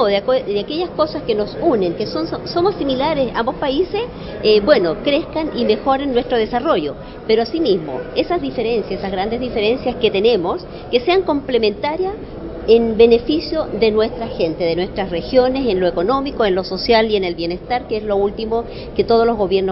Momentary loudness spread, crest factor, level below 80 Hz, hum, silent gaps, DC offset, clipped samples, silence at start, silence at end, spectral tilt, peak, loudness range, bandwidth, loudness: 8 LU; 18 dB; -38 dBFS; none; none; under 0.1%; under 0.1%; 0 s; 0 s; -9.5 dB/octave; 0 dBFS; 2 LU; 5.8 kHz; -18 LUFS